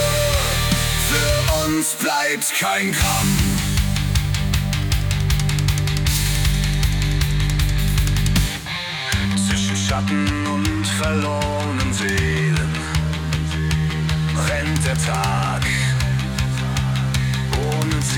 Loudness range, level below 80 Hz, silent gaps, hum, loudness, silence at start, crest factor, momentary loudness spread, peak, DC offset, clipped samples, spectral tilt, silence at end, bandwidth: 2 LU; -26 dBFS; none; none; -20 LUFS; 0 s; 14 dB; 4 LU; -4 dBFS; under 0.1%; under 0.1%; -4.5 dB/octave; 0 s; 19.5 kHz